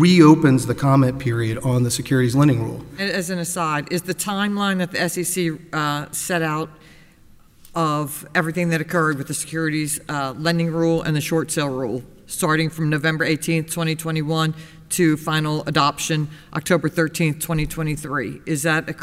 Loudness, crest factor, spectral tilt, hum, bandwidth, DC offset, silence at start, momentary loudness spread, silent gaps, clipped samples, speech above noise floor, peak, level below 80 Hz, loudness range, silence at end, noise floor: -21 LUFS; 20 dB; -5 dB/octave; none; 16 kHz; under 0.1%; 0 s; 8 LU; none; under 0.1%; 29 dB; 0 dBFS; -46 dBFS; 4 LU; 0 s; -49 dBFS